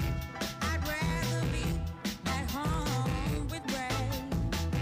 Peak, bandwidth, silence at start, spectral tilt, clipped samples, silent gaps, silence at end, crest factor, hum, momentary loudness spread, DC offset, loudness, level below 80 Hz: -20 dBFS; 16 kHz; 0 s; -5 dB/octave; under 0.1%; none; 0 s; 12 dB; none; 4 LU; under 0.1%; -33 LUFS; -40 dBFS